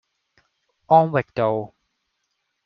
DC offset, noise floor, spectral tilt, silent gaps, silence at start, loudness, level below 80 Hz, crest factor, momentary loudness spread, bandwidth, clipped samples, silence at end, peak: under 0.1%; -75 dBFS; -6 dB/octave; none; 0.9 s; -20 LUFS; -64 dBFS; 20 dB; 12 LU; 5.8 kHz; under 0.1%; 1 s; -2 dBFS